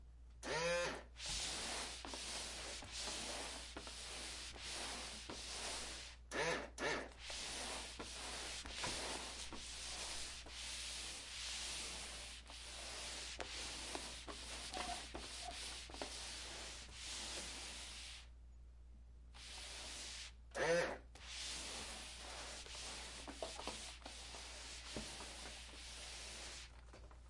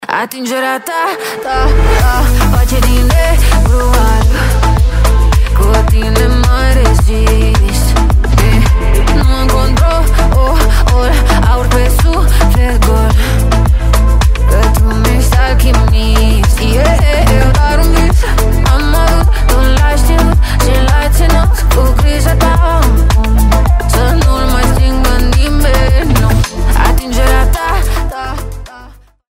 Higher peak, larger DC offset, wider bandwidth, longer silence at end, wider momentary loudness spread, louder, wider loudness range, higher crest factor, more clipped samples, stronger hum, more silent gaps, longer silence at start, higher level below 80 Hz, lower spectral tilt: second, -26 dBFS vs 0 dBFS; neither; second, 11.5 kHz vs 16.5 kHz; second, 0 s vs 0.45 s; first, 10 LU vs 3 LU; second, -46 LUFS vs -11 LUFS; first, 5 LU vs 1 LU; first, 22 dB vs 8 dB; neither; neither; neither; about the same, 0 s vs 0 s; second, -60 dBFS vs -10 dBFS; second, -1.5 dB/octave vs -5.5 dB/octave